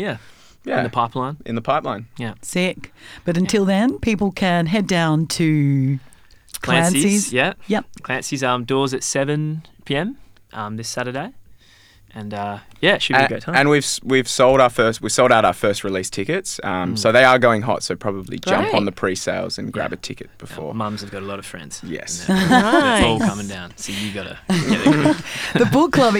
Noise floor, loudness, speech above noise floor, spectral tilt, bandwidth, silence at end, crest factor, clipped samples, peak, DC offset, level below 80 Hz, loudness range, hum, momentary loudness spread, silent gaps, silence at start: -50 dBFS; -19 LUFS; 31 dB; -4.5 dB/octave; 17.5 kHz; 0 s; 20 dB; under 0.1%; 0 dBFS; under 0.1%; -46 dBFS; 8 LU; none; 15 LU; none; 0 s